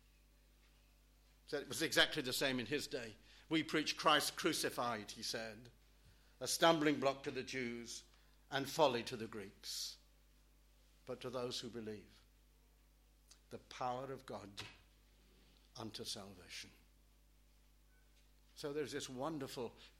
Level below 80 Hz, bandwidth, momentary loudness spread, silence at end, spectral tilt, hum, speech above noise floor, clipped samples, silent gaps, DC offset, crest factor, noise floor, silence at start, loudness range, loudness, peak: -70 dBFS; 16.5 kHz; 18 LU; 0.1 s; -3 dB/octave; 50 Hz at -70 dBFS; 28 dB; under 0.1%; none; under 0.1%; 26 dB; -69 dBFS; 1.5 s; 14 LU; -40 LUFS; -16 dBFS